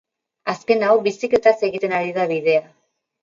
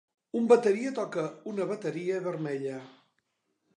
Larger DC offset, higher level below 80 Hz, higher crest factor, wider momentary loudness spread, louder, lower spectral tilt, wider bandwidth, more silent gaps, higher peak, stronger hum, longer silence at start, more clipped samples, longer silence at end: neither; first, -64 dBFS vs -84 dBFS; about the same, 18 dB vs 22 dB; second, 9 LU vs 13 LU; first, -19 LUFS vs -29 LUFS; about the same, -5.5 dB/octave vs -6.5 dB/octave; second, 7.6 kHz vs 10.5 kHz; neither; first, -2 dBFS vs -8 dBFS; neither; about the same, 0.45 s vs 0.35 s; neither; second, 0.6 s vs 0.85 s